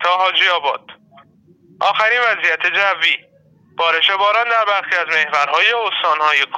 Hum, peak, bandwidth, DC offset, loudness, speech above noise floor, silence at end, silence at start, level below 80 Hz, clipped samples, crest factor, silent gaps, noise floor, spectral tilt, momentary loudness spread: none; -2 dBFS; 15 kHz; under 0.1%; -15 LUFS; 36 dB; 0 s; 0 s; -76 dBFS; under 0.1%; 16 dB; none; -52 dBFS; -0.5 dB/octave; 6 LU